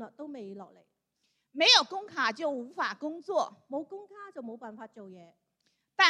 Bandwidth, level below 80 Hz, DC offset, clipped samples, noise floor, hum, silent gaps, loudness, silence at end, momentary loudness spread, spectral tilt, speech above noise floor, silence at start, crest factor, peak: 11.5 kHz; -90 dBFS; under 0.1%; under 0.1%; -78 dBFS; none; none; -27 LUFS; 0 s; 25 LU; -1 dB/octave; 46 dB; 0 s; 26 dB; -6 dBFS